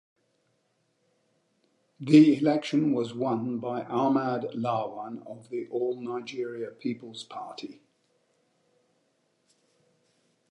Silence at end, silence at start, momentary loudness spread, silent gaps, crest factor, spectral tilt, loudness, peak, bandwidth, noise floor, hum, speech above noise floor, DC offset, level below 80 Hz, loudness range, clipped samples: 2.8 s; 2 s; 19 LU; none; 22 dB; -7 dB/octave; -27 LUFS; -6 dBFS; 9.8 kHz; -73 dBFS; none; 46 dB; under 0.1%; -82 dBFS; 17 LU; under 0.1%